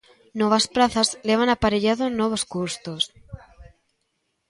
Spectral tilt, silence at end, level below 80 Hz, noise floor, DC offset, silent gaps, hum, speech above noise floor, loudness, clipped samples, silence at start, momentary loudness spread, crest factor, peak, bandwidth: -3.5 dB/octave; 0.85 s; -48 dBFS; -74 dBFS; under 0.1%; none; none; 52 dB; -22 LUFS; under 0.1%; 0.35 s; 8 LU; 20 dB; -4 dBFS; 11.5 kHz